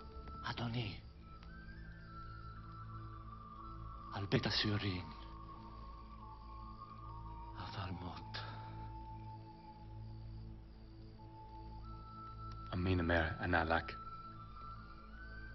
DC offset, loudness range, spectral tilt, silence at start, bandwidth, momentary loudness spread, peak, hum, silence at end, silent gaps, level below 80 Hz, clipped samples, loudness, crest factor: under 0.1%; 13 LU; -4 dB/octave; 0 s; 6.2 kHz; 19 LU; -20 dBFS; none; 0 s; none; -54 dBFS; under 0.1%; -43 LUFS; 24 dB